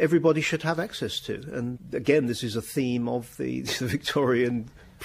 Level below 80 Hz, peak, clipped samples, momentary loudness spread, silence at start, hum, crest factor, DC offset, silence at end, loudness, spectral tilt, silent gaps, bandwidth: -56 dBFS; -6 dBFS; under 0.1%; 9 LU; 0 s; none; 20 dB; under 0.1%; 0 s; -27 LUFS; -5.5 dB/octave; none; 15.5 kHz